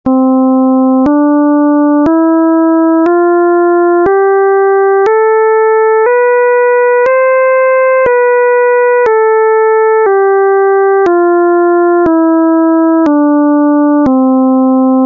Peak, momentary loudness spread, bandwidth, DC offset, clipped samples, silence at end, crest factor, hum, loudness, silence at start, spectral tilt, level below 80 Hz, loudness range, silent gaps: -2 dBFS; 0 LU; 4 kHz; under 0.1%; under 0.1%; 0 s; 6 dB; none; -8 LUFS; 0.05 s; -8.5 dB/octave; -48 dBFS; 0 LU; none